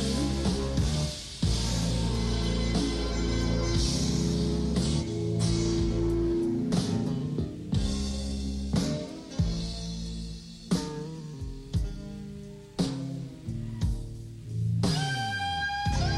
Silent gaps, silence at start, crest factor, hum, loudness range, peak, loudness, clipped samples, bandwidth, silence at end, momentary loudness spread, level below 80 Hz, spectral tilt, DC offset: none; 0 s; 14 dB; none; 7 LU; -14 dBFS; -30 LUFS; under 0.1%; 13 kHz; 0 s; 11 LU; -36 dBFS; -5.5 dB/octave; under 0.1%